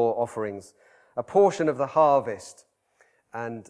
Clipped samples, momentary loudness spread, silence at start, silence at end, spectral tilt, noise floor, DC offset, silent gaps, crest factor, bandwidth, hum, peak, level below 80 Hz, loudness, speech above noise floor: under 0.1%; 19 LU; 0 s; 0.1 s; -6 dB/octave; -65 dBFS; under 0.1%; none; 18 dB; 11 kHz; none; -8 dBFS; -70 dBFS; -24 LUFS; 40 dB